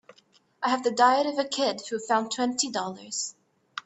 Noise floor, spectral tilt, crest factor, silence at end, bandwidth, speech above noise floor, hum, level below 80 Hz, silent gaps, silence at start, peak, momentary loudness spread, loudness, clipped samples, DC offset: -63 dBFS; -2 dB/octave; 20 dB; 0.05 s; 8.4 kHz; 37 dB; none; -76 dBFS; none; 0.6 s; -8 dBFS; 11 LU; -26 LUFS; under 0.1%; under 0.1%